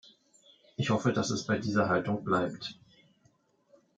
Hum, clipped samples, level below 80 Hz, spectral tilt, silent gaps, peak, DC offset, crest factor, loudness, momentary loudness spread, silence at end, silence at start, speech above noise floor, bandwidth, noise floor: none; under 0.1%; -68 dBFS; -5.5 dB/octave; none; -14 dBFS; under 0.1%; 18 dB; -30 LUFS; 13 LU; 1.25 s; 0.8 s; 39 dB; 9.2 kHz; -69 dBFS